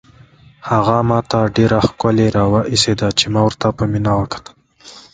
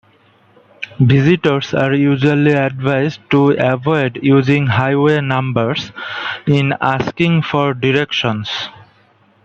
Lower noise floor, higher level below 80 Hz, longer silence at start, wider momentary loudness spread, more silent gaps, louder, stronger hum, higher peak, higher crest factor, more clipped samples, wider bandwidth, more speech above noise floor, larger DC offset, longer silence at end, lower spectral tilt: second, -45 dBFS vs -52 dBFS; first, -38 dBFS vs -52 dBFS; second, 0.65 s vs 0.8 s; second, 5 LU vs 9 LU; neither; about the same, -15 LUFS vs -15 LUFS; neither; about the same, 0 dBFS vs 0 dBFS; about the same, 16 dB vs 14 dB; neither; first, 9.4 kHz vs 7.2 kHz; second, 30 dB vs 38 dB; neither; second, 0.15 s vs 0.6 s; second, -5.5 dB/octave vs -7.5 dB/octave